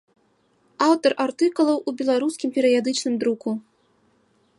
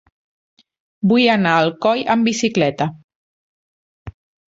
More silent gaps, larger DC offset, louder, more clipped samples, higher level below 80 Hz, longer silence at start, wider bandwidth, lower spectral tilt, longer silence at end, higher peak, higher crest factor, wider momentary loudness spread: second, none vs 3.04-3.09 s, 3.15-4.06 s; neither; second, -22 LUFS vs -17 LUFS; neither; second, -76 dBFS vs -54 dBFS; second, 0.8 s vs 1.05 s; first, 11.5 kHz vs 8 kHz; about the same, -4 dB/octave vs -5 dB/octave; first, 1 s vs 0.4 s; about the same, -4 dBFS vs -2 dBFS; about the same, 18 dB vs 18 dB; second, 5 LU vs 8 LU